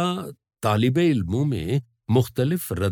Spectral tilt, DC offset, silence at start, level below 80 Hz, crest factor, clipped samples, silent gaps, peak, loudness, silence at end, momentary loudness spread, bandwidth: -7 dB/octave; under 0.1%; 0 s; -52 dBFS; 14 dB; under 0.1%; none; -8 dBFS; -23 LUFS; 0 s; 8 LU; 19.5 kHz